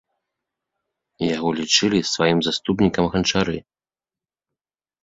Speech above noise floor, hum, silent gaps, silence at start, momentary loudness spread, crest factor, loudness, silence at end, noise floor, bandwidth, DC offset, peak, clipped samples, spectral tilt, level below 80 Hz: over 70 dB; none; none; 1.2 s; 8 LU; 20 dB; -20 LUFS; 1.45 s; under -90 dBFS; 7.8 kHz; under 0.1%; -2 dBFS; under 0.1%; -4 dB/octave; -48 dBFS